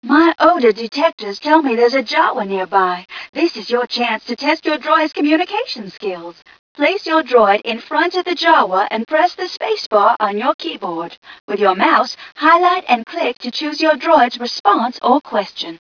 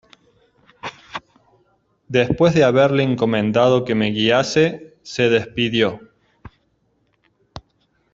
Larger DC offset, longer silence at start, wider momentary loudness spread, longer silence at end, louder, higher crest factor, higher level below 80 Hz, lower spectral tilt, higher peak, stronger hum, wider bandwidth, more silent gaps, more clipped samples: neither; second, 0 s vs 0.85 s; second, 11 LU vs 20 LU; second, 0.05 s vs 0.55 s; about the same, -16 LUFS vs -17 LUFS; about the same, 16 dB vs 18 dB; second, -64 dBFS vs -52 dBFS; second, -4 dB/octave vs -6 dB/octave; about the same, 0 dBFS vs -2 dBFS; neither; second, 5.4 kHz vs 7.8 kHz; first, 1.13-1.18 s, 3.29-3.33 s, 6.59-6.75 s, 9.86-9.91 s, 10.54-10.59 s, 11.17-11.22 s, 11.40-11.48 s, 14.60-14.64 s vs none; neither